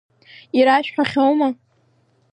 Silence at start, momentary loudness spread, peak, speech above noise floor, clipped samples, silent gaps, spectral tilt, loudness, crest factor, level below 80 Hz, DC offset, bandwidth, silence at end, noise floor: 0.55 s; 8 LU; -2 dBFS; 44 dB; under 0.1%; none; -5.5 dB/octave; -18 LUFS; 16 dB; -66 dBFS; under 0.1%; 9.4 kHz; 0.8 s; -60 dBFS